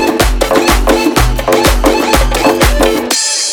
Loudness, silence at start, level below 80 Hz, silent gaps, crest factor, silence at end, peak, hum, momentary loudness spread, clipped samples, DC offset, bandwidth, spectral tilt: -10 LUFS; 0 s; -16 dBFS; none; 10 dB; 0 s; 0 dBFS; none; 2 LU; 0.8%; under 0.1%; over 20 kHz; -3.5 dB/octave